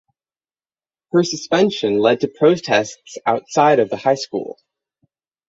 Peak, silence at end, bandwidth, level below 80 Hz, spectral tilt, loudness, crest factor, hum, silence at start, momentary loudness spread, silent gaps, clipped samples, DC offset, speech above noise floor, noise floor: -2 dBFS; 0.95 s; 8 kHz; -62 dBFS; -5 dB/octave; -17 LUFS; 18 dB; none; 1.15 s; 10 LU; none; under 0.1%; under 0.1%; over 73 dB; under -90 dBFS